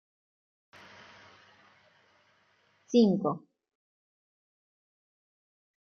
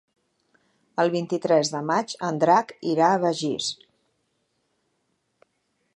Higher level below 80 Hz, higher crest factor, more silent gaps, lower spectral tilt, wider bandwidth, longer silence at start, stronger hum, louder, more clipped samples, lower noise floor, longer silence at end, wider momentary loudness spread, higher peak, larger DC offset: about the same, -80 dBFS vs -76 dBFS; about the same, 24 dB vs 20 dB; neither; first, -7 dB/octave vs -4.5 dB/octave; second, 6.8 kHz vs 11.5 kHz; first, 2.9 s vs 0.95 s; neither; second, -27 LUFS vs -23 LUFS; neither; second, -69 dBFS vs -73 dBFS; first, 2.5 s vs 2.25 s; first, 28 LU vs 9 LU; second, -12 dBFS vs -6 dBFS; neither